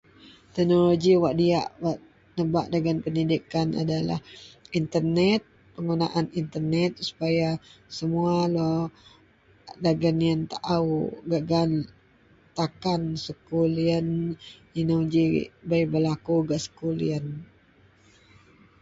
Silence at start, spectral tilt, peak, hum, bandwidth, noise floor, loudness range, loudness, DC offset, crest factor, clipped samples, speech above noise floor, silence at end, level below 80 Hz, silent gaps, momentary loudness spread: 0.25 s; -7 dB/octave; -10 dBFS; none; 7.8 kHz; -58 dBFS; 3 LU; -26 LUFS; under 0.1%; 16 dB; under 0.1%; 34 dB; 1.35 s; -56 dBFS; none; 11 LU